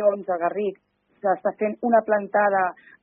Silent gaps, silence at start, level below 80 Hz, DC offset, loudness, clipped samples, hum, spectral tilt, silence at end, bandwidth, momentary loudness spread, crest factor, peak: none; 0 s; -72 dBFS; under 0.1%; -23 LUFS; under 0.1%; none; -5.5 dB/octave; 0.3 s; 3.5 kHz; 8 LU; 16 dB; -6 dBFS